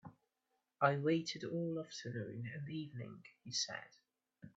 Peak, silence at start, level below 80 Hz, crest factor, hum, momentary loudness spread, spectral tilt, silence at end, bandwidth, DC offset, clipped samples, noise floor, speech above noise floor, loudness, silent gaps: -18 dBFS; 0.05 s; -82 dBFS; 24 dB; none; 15 LU; -4.5 dB/octave; 0.1 s; 8 kHz; under 0.1%; under 0.1%; -86 dBFS; 46 dB; -40 LUFS; none